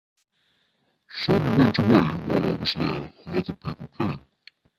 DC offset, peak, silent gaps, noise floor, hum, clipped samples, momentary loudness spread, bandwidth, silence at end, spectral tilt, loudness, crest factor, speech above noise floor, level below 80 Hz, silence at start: under 0.1%; -4 dBFS; none; -70 dBFS; none; under 0.1%; 15 LU; 13.5 kHz; 0.6 s; -7.5 dB/octave; -24 LUFS; 20 dB; 47 dB; -52 dBFS; 1.1 s